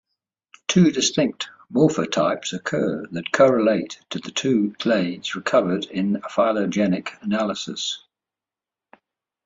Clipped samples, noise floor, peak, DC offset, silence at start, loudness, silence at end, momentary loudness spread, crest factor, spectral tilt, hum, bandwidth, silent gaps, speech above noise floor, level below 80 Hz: under 0.1%; -89 dBFS; -4 dBFS; under 0.1%; 0.7 s; -22 LUFS; 1.45 s; 10 LU; 18 dB; -5 dB/octave; none; 8 kHz; none; 68 dB; -62 dBFS